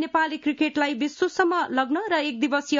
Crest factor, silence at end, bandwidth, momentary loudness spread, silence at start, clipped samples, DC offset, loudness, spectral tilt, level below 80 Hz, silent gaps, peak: 16 dB; 0 s; 7.6 kHz; 3 LU; 0 s; under 0.1%; under 0.1%; -24 LUFS; -3 dB/octave; -68 dBFS; none; -8 dBFS